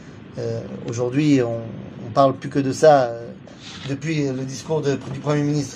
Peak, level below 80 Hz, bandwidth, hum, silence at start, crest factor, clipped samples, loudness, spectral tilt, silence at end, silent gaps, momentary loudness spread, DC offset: -2 dBFS; -56 dBFS; 10.5 kHz; none; 0 s; 20 dB; under 0.1%; -21 LUFS; -6.5 dB/octave; 0 s; none; 18 LU; under 0.1%